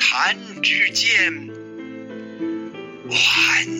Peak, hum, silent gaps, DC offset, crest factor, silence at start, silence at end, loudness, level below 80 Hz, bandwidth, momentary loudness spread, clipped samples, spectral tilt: -4 dBFS; none; none; under 0.1%; 16 dB; 0 s; 0 s; -17 LUFS; -64 dBFS; 16.5 kHz; 20 LU; under 0.1%; -1 dB/octave